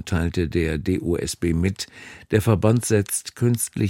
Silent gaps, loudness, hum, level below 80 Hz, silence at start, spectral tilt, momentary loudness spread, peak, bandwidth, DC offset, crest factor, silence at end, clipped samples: none; -22 LUFS; none; -38 dBFS; 0 s; -5.5 dB/octave; 7 LU; -2 dBFS; 17 kHz; under 0.1%; 18 dB; 0 s; under 0.1%